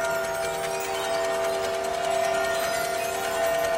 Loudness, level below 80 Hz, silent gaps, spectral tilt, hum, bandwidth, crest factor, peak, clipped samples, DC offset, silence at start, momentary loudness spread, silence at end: -26 LUFS; -56 dBFS; none; -2 dB/octave; none; 16.5 kHz; 12 dB; -14 dBFS; under 0.1%; under 0.1%; 0 s; 3 LU; 0 s